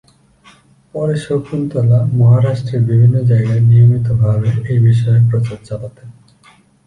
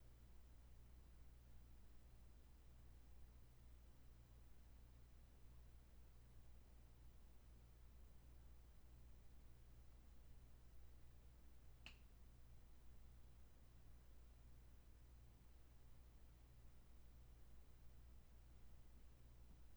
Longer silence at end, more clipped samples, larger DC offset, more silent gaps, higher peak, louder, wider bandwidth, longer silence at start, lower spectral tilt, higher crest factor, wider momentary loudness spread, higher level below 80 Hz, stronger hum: first, 0.75 s vs 0 s; neither; neither; neither; first, -2 dBFS vs -42 dBFS; first, -13 LUFS vs -69 LUFS; second, 9.4 kHz vs over 20 kHz; first, 0.95 s vs 0 s; first, -9.5 dB/octave vs -5 dB/octave; second, 10 dB vs 22 dB; first, 11 LU vs 1 LU; first, -42 dBFS vs -66 dBFS; neither